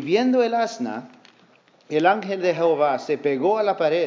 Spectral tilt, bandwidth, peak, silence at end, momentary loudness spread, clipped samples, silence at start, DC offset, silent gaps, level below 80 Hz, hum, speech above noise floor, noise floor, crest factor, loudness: -5.5 dB/octave; 7.6 kHz; -4 dBFS; 0 s; 7 LU; under 0.1%; 0 s; under 0.1%; none; -84 dBFS; none; 35 dB; -56 dBFS; 18 dB; -21 LUFS